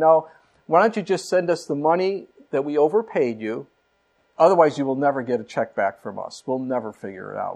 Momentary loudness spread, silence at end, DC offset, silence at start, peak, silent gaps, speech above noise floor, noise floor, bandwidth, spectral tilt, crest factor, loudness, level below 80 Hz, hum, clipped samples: 15 LU; 0 s; under 0.1%; 0 s; -2 dBFS; none; 44 dB; -66 dBFS; 11 kHz; -6 dB/octave; 20 dB; -22 LUFS; -74 dBFS; none; under 0.1%